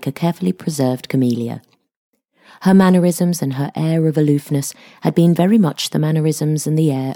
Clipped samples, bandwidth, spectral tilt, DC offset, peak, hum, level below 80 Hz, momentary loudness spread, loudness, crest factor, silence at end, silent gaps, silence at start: under 0.1%; 18 kHz; -6.5 dB/octave; under 0.1%; -2 dBFS; none; -60 dBFS; 9 LU; -17 LUFS; 14 dB; 0 s; 1.96-2.13 s; 0 s